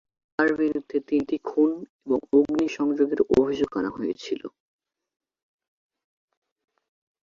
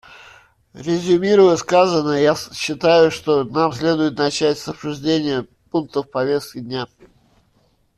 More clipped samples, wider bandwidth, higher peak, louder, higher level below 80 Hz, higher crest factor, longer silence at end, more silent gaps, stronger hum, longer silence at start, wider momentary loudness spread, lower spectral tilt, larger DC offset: neither; second, 7.4 kHz vs 13.5 kHz; second, -6 dBFS vs -2 dBFS; second, -25 LUFS vs -18 LUFS; about the same, -60 dBFS vs -56 dBFS; about the same, 20 dB vs 16 dB; first, 2.75 s vs 1.15 s; first, 1.89-1.99 s vs none; neither; second, 0.4 s vs 0.75 s; about the same, 11 LU vs 13 LU; about the same, -6 dB/octave vs -5 dB/octave; neither